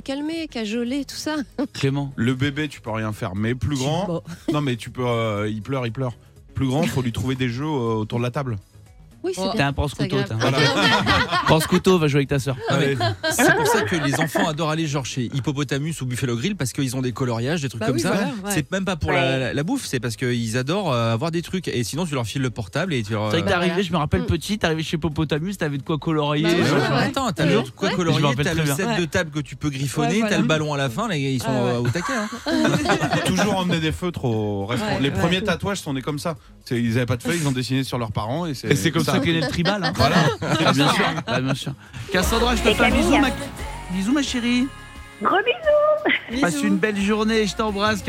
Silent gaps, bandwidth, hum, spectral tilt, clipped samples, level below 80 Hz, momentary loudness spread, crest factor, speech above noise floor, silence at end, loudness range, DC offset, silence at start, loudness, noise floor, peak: none; 16 kHz; none; -5 dB/octave; under 0.1%; -42 dBFS; 9 LU; 18 dB; 25 dB; 0 s; 5 LU; under 0.1%; 0.05 s; -22 LUFS; -47 dBFS; -2 dBFS